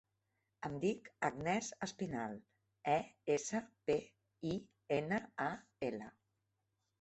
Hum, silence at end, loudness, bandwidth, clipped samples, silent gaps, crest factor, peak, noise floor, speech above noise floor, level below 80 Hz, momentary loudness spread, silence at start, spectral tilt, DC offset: none; 0.9 s; -41 LUFS; 8.2 kHz; under 0.1%; none; 20 dB; -20 dBFS; -85 dBFS; 46 dB; -72 dBFS; 9 LU; 0.6 s; -5 dB/octave; under 0.1%